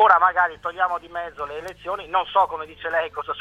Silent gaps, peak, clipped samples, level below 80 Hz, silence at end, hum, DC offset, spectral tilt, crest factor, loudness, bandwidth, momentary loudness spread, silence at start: none; -2 dBFS; under 0.1%; -56 dBFS; 0 s; none; under 0.1%; -3.5 dB/octave; 20 dB; -23 LUFS; 12.5 kHz; 14 LU; 0 s